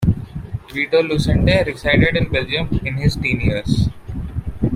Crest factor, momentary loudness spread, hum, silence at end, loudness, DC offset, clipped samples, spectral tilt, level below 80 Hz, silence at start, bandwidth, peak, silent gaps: 16 dB; 12 LU; none; 0 s; -18 LUFS; under 0.1%; under 0.1%; -6.5 dB/octave; -28 dBFS; 0 s; 15 kHz; -2 dBFS; none